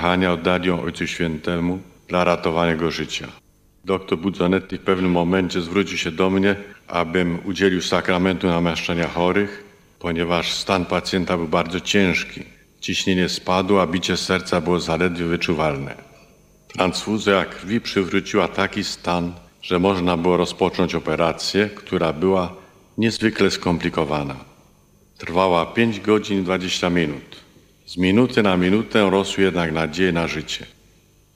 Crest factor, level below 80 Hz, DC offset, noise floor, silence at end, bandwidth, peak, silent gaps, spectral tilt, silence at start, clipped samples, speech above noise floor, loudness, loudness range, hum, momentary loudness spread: 20 dB; -48 dBFS; under 0.1%; -55 dBFS; 0.7 s; 15.5 kHz; -2 dBFS; none; -5 dB/octave; 0 s; under 0.1%; 34 dB; -20 LUFS; 3 LU; none; 8 LU